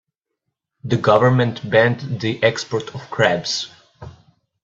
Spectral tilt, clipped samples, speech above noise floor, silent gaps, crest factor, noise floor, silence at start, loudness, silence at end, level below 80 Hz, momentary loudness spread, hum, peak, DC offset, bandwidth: -5.5 dB/octave; under 0.1%; 60 dB; none; 20 dB; -78 dBFS; 0.85 s; -18 LUFS; 0.5 s; -56 dBFS; 12 LU; none; 0 dBFS; under 0.1%; 7.8 kHz